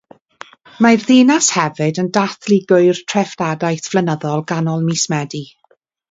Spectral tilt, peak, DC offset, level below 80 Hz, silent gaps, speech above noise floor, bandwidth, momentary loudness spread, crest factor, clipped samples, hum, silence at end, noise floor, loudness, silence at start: -4.5 dB/octave; 0 dBFS; under 0.1%; -62 dBFS; none; 43 dB; 8 kHz; 9 LU; 16 dB; under 0.1%; none; 0.65 s; -58 dBFS; -15 LUFS; 0.8 s